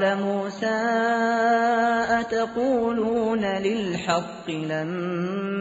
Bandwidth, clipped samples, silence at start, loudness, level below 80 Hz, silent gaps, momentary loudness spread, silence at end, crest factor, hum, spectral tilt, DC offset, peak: 8 kHz; under 0.1%; 0 s; -24 LUFS; -58 dBFS; none; 7 LU; 0 s; 14 dB; none; -4 dB/octave; under 0.1%; -10 dBFS